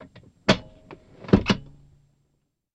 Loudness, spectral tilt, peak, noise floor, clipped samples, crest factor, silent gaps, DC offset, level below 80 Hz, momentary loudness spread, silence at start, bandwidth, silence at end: -24 LUFS; -6 dB/octave; -2 dBFS; -73 dBFS; under 0.1%; 24 dB; none; under 0.1%; -44 dBFS; 7 LU; 0.5 s; 9.4 kHz; 1.1 s